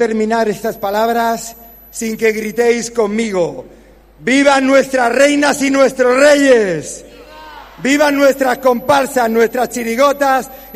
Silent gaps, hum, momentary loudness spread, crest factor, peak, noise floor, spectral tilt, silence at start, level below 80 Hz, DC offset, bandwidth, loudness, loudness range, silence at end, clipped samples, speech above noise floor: none; none; 12 LU; 14 dB; 0 dBFS; -35 dBFS; -3.5 dB/octave; 0 s; -48 dBFS; under 0.1%; 15.5 kHz; -13 LUFS; 5 LU; 0 s; under 0.1%; 22 dB